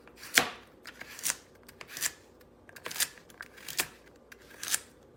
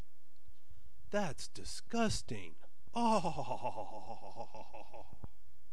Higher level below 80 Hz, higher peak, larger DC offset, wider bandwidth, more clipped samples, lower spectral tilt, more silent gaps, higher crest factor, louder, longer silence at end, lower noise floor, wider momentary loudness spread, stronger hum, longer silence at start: second, -68 dBFS vs -58 dBFS; first, 0 dBFS vs -20 dBFS; second, under 0.1% vs 2%; first, 18 kHz vs 13.5 kHz; neither; second, 0.5 dB/octave vs -4.5 dB/octave; neither; first, 36 dB vs 22 dB; first, -32 LUFS vs -39 LUFS; second, 0.3 s vs 0.45 s; second, -57 dBFS vs -68 dBFS; about the same, 23 LU vs 21 LU; neither; second, 0.05 s vs 0.7 s